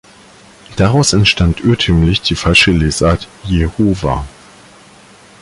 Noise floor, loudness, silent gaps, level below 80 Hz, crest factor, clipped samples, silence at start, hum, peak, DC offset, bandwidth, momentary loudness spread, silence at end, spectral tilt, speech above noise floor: -41 dBFS; -12 LUFS; none; -26 dBFS; 14 dB; under 0.1%; 0.7 s; none; 0 dBFS; under 0.1%; 11.5 kHz; 10 LU; 1.1 s; -5 dB/octave; 29 dB